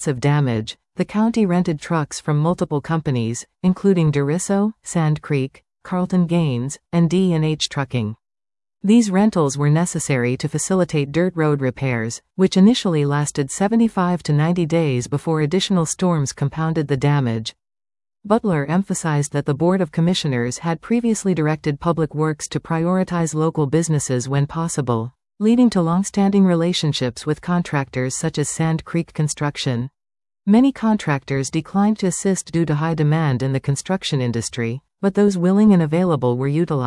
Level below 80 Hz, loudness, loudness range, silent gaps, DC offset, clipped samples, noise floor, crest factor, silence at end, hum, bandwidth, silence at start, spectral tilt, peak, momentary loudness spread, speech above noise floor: -52 dBFS; -19 LUFS; 2 LU; none; under 0.1%; under 0.1%; under -90 dBFS; 16 dB; 0 s; none; 12 kHz; 0 s; -6 dB/octave; -2 dBFS; 7 LU; over 72 dB